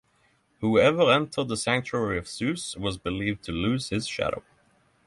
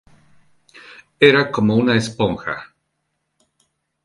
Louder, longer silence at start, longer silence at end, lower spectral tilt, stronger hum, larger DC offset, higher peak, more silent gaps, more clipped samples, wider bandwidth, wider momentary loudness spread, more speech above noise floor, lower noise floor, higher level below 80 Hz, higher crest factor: second, -26 LUFS vs -17 LUFS; second, 0.6 s vs 1.2 s; second, 0.65 s vs 1.4 s; about the same, -5 dB/octave vs -6 dB/octave; neither; neither; second, -8 dBFS vs 0 dBFS; neither; neither; about the same, 11.5 kHz vs 11.5 kHz; second, 10 LU vs 14 LU; second, 40 dB vs 57 dB; second, -66 dBFS vs -73 dBFS; about the same, -50 dBFS vs -52 dBFS; about the same, 18 dB vs 20 dB